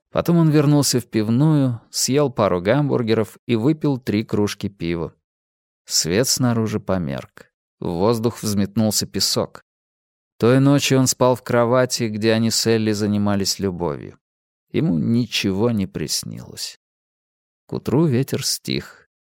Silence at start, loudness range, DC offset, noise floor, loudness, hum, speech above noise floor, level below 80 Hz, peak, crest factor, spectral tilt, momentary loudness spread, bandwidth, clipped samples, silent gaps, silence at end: 0.15 s; 5 LU; under 0.1%; under -90 dBFS; -19 LUFS; none; over 71 dB; -54 dBFS; -2 dBFS; 18 dB; -5 dB/octave; 11 LU; 17 kHz; under 0.1%; 3.39-3.47 s, 5.24-5.85 s, 7.54-7.78 s, 9.62-10.39 s, 14.21-14.67 s, 16.76-17.68 s; 0.45 s